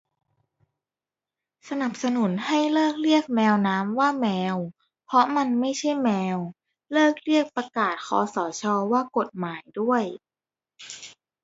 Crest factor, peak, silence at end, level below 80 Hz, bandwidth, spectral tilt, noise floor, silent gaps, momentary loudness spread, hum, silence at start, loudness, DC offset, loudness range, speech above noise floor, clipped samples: 20 dB; -6 dBFS; 0.35 s; -74 dBFS; 8 kHz; -5 dB/octave; under -90 dBFS; none; 13 LU; none; 1.65 s; -24 LUFS; under 0.1%; 4 LU; over 66 dB; under 0.1%